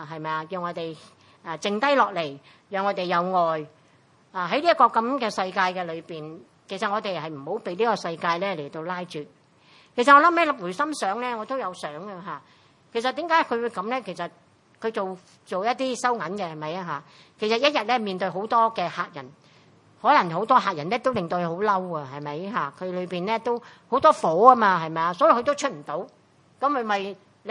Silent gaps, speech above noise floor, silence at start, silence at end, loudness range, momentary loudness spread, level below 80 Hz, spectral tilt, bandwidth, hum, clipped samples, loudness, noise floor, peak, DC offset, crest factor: none; 34 dB; 0 s; 0 s; 7 LU; 16 LU; -74 dBFS; -4.5 dB/octave; 11.5 kHz; none; under 0.1%; -24 LUFS; -59 dBFS; 0 dBFS; under 0.1%; 24 dB